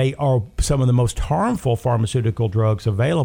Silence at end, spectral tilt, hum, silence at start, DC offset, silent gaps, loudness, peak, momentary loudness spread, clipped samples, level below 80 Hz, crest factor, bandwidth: 0 s; -6.5 dB/octave; none; 0 s; under 0.1%; none; -20 LUFS; -6 dBFS; 3 LU; under 0.1%; -32 dBFS; 12 dB; 16 kHz